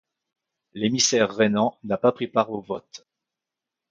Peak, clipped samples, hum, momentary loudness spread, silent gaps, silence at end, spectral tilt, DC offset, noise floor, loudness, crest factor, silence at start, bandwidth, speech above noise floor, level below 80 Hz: -4 dBFS; under 0.1%; none; 14 LU; none; 0.95 s; -3.5 dB/octave; under 0.1%; -87 dBFS; -23 LUFS; 20 dB; 0.75 s; 9.4 kHz; 64 dB; -66 dBFS